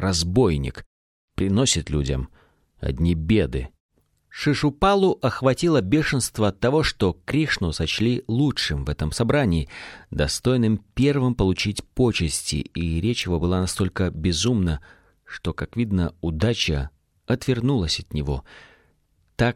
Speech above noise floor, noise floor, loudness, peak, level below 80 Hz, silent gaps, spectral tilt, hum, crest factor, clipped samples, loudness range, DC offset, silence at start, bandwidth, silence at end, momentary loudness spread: 42 dB; -64 dBFS; -23 LUFS; -6 dBFS; -36 dBFS; 0.86-1.28 s, 3.80-3.89 s; -5 dB/octave; none; 16 dB; under 0.1%; 4 LU; under 0.1%; 0 s; 15 kHz; 0 s; 10 LU